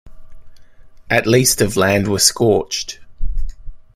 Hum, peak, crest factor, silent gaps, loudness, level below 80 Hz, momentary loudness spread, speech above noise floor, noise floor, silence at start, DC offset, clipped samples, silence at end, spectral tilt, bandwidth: none; 0 dBFS; 18 dB; none; -15 LUFS; -28 dBFS; 18 LU; 24 dB; -39 dBFS; 0.05 s; under 0.1%; under 0.1%; 0.15 s; -3.5 dB/octave; 16 kHz